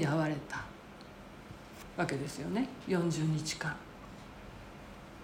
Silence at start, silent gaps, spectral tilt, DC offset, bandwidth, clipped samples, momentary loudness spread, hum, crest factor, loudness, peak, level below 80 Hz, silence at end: 0 s; none; -5.5 dB/octave; under 0.1%; 16.5 kHz; under 0.1%; 18 LU; none; 22 dB; -35 LUFS; -16 dBFS; -58 dBFS; 0 s